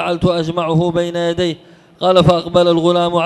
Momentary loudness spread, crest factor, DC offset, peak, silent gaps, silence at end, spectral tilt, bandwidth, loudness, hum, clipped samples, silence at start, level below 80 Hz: 8 LU; 14 dB; under 0.1%; 0 dBFS; none; 0 s; -6.5 dB/octave; 11.5 kHz; -15 LUFS; none; under 0.1%; 0 s; -40 dBFS